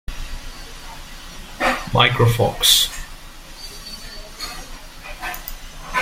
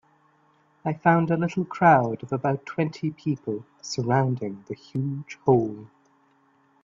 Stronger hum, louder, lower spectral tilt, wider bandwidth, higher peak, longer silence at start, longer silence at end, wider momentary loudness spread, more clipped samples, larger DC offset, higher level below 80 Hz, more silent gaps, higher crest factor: neither; first, -18 LUFS vs -25 LUFS; second, -3 dB/octave vs -7 dB/octave; first, 16.5 kHz vs 7.6 kHz; first, 0 dBFS vs -4 dBFS; second, 0.1 s vs 0.85 s; second, 0 s vs 1 s; first, 23 LU vs 14 LU; neither; neither; first, -34 dBFS vs -64 dBFS; neither; about the same, 22 dB vs 20 dB